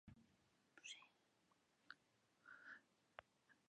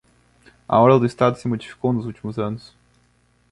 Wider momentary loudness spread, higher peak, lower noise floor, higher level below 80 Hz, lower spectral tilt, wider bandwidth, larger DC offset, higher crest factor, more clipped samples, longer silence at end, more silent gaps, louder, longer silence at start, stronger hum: second, 7 LU vs 14 LU; second, -36 dBFS vs -2 dBFS; first, -82 dBFS vs -61 dBFS; second, -88 dBFS vs -56 dBFS; second, -1.5 dB/octave vs -8 dB/octave; second, 9.4 kHz vs 11.5 kHz; neither; first, 30 dB vs 20 dB; neither; second, 0 s vs 0.95 s; neither; second, -63 LUFS vs -20 LUFS; second, 0.05 s vs 0.7 s; second, none vs 60 Hz at -40 dBFS